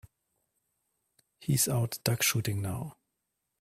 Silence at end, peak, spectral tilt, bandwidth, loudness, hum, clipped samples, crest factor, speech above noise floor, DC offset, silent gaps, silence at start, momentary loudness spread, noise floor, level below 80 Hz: 0.7 s; -8 dBFS; -3.5 dB/octave; 16 kHz; -29 LUFS; none; under 0.1%; 24 dB; 54 dB; under 0.1%; none; 1.4 s; 13 LU; -83 dBFS; -62 dBFS